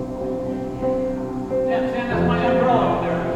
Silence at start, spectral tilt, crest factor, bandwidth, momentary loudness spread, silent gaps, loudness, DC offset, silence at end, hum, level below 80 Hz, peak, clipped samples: 0 s; -8 dB/octave; 16 dB; 8.8 kHz; 9 LU; none; -21 LUFS; under 0.1%; 0 s; none; -40 dBFS; -6 dBFS; under 0.1%